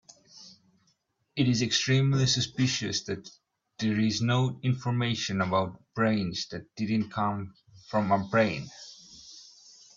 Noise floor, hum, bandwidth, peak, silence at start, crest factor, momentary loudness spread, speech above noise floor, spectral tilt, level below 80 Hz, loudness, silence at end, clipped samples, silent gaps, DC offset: -73 dBFS; none; 7.6 kHz; -10 dBFS; 0.35 s; 18 dB; 19 LU; 45 dB; -5 dB/octave; -62 dBFS; -28 LUFS; 0.55 s; under 0.1%; none; under 0.1%